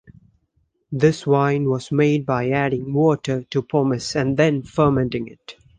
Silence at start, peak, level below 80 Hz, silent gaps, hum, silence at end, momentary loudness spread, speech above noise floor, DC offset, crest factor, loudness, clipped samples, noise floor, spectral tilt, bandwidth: 0.9 s; -4 dBFS; -50 dBFS; none; none; 0.25 s; 6 LU; 48 dB; under 0.1%; 18 dB; -20 LUFS; under 0.1%; -67 dBFS; -7 dB/octave; 9.6 kHz